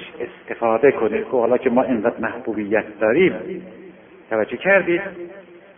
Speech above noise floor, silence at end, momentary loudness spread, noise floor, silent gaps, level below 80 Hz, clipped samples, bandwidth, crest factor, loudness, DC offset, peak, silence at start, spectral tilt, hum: 24 dB; 0.2 s; 16 LU; -43 dBFS; none; -58 dBFS; under 0.1%; 3.7 kHz; 18 dB; -19 LUFS; under 0.1%; -2 dBFS; 0 s; -11 dB/octave; none